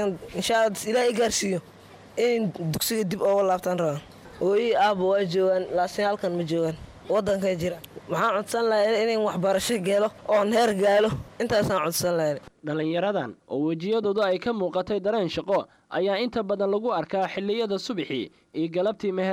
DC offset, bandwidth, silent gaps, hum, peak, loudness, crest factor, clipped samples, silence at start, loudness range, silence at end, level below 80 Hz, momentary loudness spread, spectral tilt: under 0.1%; 16 kHz; none; none; -12 dBFS; -25 LUFS; 14 dB; under 0.1%; 0 s; 3 LU; 0 s; -56 dBFS; 8 LU; -4.5 dB/octave